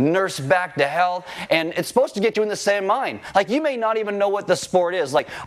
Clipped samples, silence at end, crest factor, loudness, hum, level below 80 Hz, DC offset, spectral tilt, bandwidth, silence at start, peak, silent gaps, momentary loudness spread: under 0.1%; 0 s; 16 dB; -21 LUFS; none; -62 dBFS; under 0.1%; -4.5 dB/octave; 15 kHz; 0 s; -4 dBFS; none; 3 LU